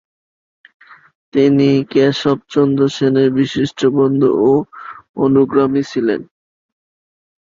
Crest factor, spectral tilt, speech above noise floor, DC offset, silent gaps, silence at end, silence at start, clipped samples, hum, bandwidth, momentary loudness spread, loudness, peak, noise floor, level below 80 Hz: 14 dB; -7 dB/octave; over 76 dB; under 0.1%; 5.09-5.14 s; 1.3 s; 1.35 s; under 0.1%; none; 7.6 kHz; 7 LU; -14 LUFS; 0 dBFS; under -90 dBFS; -54 dBFS